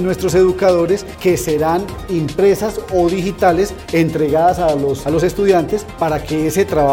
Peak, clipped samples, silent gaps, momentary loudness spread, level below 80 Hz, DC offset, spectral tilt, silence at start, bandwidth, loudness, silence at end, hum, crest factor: 0 dBFS; under 0.1%; none; 6 LU; -36 dBFS; under 0.1%; -6 dB/octave; 0 s; 17 kHz; -16 LUFS; 0 s; none; 14 dB